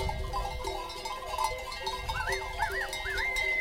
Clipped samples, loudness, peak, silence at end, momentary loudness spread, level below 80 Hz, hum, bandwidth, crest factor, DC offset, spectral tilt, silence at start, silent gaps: under 0.1%; -33 LUFS; -18 dBFS; 0 s; 7 LU; -42 dBFS; none; 17 kHz; 16 dB; under 0.1%; -3 dB/octave; 0 s; none